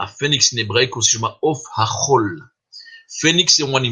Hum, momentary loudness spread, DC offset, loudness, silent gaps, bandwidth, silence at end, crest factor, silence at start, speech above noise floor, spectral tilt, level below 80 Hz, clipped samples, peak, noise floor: none; 9 LU; under 0.1%; -16 LUFS; none; 11 kHz; 0 s; 18 dB; 0 s; 24 dB; -2.5 dB/octave; -58 dBFS; under 0.1%; 0 dBFS; -42 dBFS